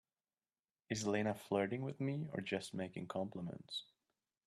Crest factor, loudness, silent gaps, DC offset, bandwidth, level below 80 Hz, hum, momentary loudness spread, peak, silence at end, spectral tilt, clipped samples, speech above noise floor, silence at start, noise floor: 20 dB; -42 LUFS; none; under 0.1%; 13 kHz; -78 dBFS; none; 8 LU; -24 dBFS; 0.65 s; -5.5 dB/octave; under 0.1%; over 49 dB; 0.9 s; under -90 dBFS